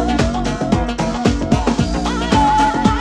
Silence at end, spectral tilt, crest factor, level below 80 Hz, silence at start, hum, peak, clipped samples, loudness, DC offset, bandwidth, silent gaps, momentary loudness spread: 0 s; -5.5 dB/octave; 16 dB; -26 dBFS; 0 s; none; 0 dBFS; under 0.1%; -17 LUFS; under 0.1%; 11.5 kHz; none; 5 LU